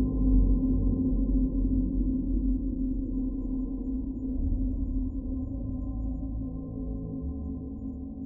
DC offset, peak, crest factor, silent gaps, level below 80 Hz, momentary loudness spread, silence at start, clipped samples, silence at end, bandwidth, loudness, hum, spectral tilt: under 0.1%; -12 dBFS; 16 dB; none; -30 dBFS; 10 LU; 0 s; under 0.1%; 0 s; 1.1 kHz; -31 LUFS; none; -15.5 dB/octave